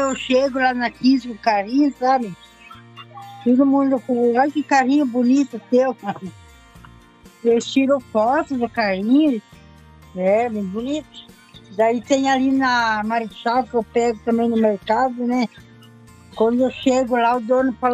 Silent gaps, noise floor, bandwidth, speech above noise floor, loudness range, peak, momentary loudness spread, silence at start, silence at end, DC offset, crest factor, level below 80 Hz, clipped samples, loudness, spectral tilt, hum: none; -47 dBFS; 8.6 kHz; 29 dB; 3 LU; -4 dBFS; 9 LU; 0 s; 0 s; under 0.1%; 16 dB; -54 dBFS; under 0.1%; -19 LUFS; -5 dB/octave; none